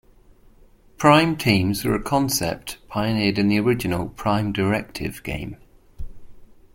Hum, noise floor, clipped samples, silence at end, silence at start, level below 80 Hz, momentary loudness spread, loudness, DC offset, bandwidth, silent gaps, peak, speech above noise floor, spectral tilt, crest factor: none; -51 dBFS; under 0.1%; 0.3 s; 1 s; -42 dBFS; 15 LU; -21 LUFS; under 0.1%; 17 kHz; none; -2 dBFS; 31 dB; -5 dB/octave; 22 dB